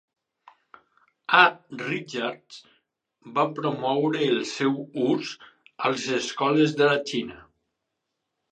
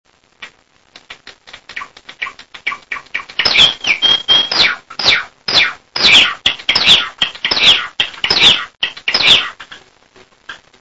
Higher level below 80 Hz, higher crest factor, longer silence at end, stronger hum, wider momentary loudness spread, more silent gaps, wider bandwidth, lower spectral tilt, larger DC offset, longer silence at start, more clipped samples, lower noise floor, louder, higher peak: second, -72 dBFS vs -48 dBFS; first, 24 dB vs 16 dB; first, 1.1 s vs 0.25 s; neither; second, 13 LU vs 17 LU; neither; second, 9.4 kHz vs 11 kHz; first, -4.5 dB/octave vs -0.5 dB/octave; second, under 0.1% vs 0.4%; first, 1.3 s vs 0.4 s; second, under 0.1% vs 0.1%; first, -81 dBFS vs -47 dBFS; second, -24 LUFS vs -10 LUFS; about the same, -2 dBFS vs 0 dBFS